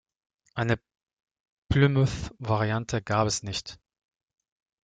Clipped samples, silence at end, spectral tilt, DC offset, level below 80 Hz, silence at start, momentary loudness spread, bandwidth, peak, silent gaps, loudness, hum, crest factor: under 0.1%; 1.1 s; -5.5 dB/octave; under 0.1%; -48 dBFS; 0.55 s; 12 LU; 9.2 kHz; -8 dBFS; 1.13-1.17 s, 1.31-1.62 s; -27 LUFS; none; 20 dB